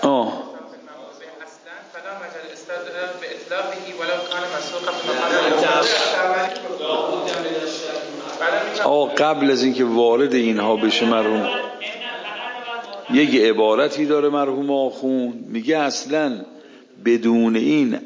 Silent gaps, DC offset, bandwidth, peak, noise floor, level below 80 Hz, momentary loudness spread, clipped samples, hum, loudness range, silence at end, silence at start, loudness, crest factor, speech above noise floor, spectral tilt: none; under 0.1%; 7.6 kHz; -2 dBFS; -41 dBFS; -74 dBFS; 17 LU; under 0.1%; none; 10 LU; 0 s; 0 s; -20 LUFS; 18 dB; 23 dB; -4 dB/octave